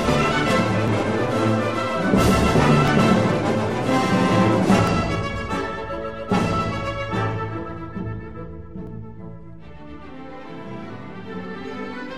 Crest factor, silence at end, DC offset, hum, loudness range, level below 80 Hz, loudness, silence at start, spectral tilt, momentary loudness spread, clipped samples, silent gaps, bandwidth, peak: 18 dB; 0 s; 0.9%; none; 17 LU; -38 dBFS; -21 LUFS; 0 s; -6 dB/octave; 20 LU; under 0.1%; none; 15 kHz; -4 dBFS